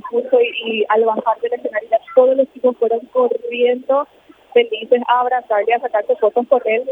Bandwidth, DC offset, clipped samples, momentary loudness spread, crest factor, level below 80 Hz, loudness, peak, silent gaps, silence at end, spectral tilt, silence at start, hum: 3.8 kHz; under 0.1%; under 0.1%; 5 LU; 16 dB; -70 dBFS; -17 LUFS; 0 dBFS; none; 0 s; -6 dB/octave; 0.05 s; none